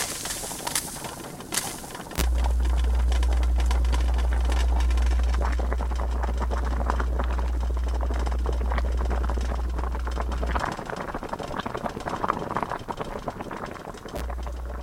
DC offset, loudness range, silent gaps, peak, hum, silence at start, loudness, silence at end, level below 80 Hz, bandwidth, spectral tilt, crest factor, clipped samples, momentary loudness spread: under 0.1%; 6 LU; none; -2 dBFS; none; 0 s; -28 LUFS; 0 s; -26 dBFS; 16 kHz; -4.5 dB/octave; 24 dB; under 0.1%; 9 LU